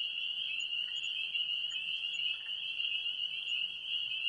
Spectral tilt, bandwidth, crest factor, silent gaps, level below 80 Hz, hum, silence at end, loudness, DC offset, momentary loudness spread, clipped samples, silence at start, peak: 2 dB/octave; 11 kHz; 14 dB; none; -78 dBFS; none; 0 s; -34 LUFS; under 0.1%; 2 LU; under 0.1%; 0 s; -22 dBFS